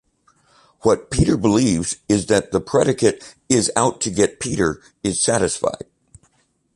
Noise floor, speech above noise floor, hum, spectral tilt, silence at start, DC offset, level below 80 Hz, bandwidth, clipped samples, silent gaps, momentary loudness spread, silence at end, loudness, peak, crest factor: -63 dBFS; 45 dB; none; -4.5 dB/octave; 0.85 s; under 0.1%; -40 dBFS; 11.5 kHz; under 0.1%; none; 7 LU; 1 s; -19 LUFS; -2 dBFS; 18 dB